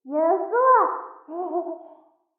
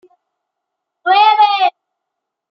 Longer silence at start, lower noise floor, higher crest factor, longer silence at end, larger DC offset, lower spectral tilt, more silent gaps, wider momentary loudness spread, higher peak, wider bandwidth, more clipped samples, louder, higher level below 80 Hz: second, 0.05 s vs 1.05 s; second, -54 dBFS vs -79 dBFS; about the same, 16 dB vs 16 dB; second, 0.55 s vs 0.85 s; neither; first, -4 dB/octave vs -1 dB/octave; neither; first, 18 LU vs 9 LU; second, -8 dBFS vs -2 dBFS; second, 2.5 kHz vs 6 kHz; neither; second, -21 LUFS vs -12 LUFS; second, under -90 dBFS vs -84 dBFS